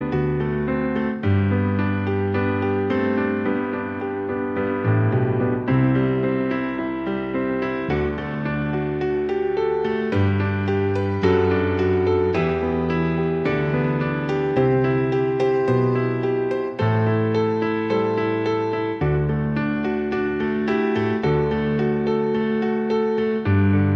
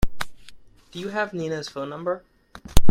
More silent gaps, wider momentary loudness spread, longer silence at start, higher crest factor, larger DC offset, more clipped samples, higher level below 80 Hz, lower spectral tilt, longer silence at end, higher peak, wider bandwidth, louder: neither; second, 5 LU vs 13 LU; about the same, 0 s vs 0 s; about the same, 16 dB vs 18 dB; neither; neither; second, -44 dBFS vs -30 dBFS; first, -9 dB/octave vs -5 dB/octave; about the same, 0 s vs 0 s; second, -6 dBFS vs -2 dBFS; second, 6.6 kHz vs 16.5 kHz; first, -22 LUFS vs -29 LUFS